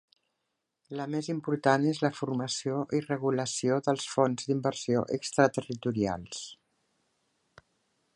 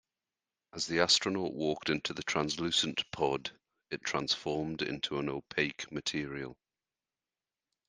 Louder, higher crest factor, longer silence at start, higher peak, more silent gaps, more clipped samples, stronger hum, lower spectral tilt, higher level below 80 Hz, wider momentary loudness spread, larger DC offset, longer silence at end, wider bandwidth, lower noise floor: first, -30 LUFS vs -33 LUFS; about the same, 22 dB vs 24 dB; first, 0.9 s vs 0.75 s; about the same, -8 dBFS vs -10 dBFS; neither; neither; neither; first, -5 dB/octave vs -3 dB/octave; about the same, -66 dBFS vs -66 dBFS; second, 9 LU vs 12 LU; neither; first, 1.6 s vs 1.35 s; first, 11.5 kHz vs 10 kHz; second, -83 dBFS vs under -90 dBFS